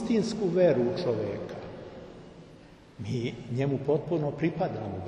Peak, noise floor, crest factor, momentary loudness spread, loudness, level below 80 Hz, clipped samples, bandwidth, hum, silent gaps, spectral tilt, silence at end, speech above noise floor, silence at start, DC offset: -12 dBFS; -52 dBFS; 16 dB; 21 LU; -29 LUFS; -58 dBFS; under 0.1%; 10 kHz; none; none; -7.5 dB/octave; 0 s; 24 dB; 0 s; under 0.1%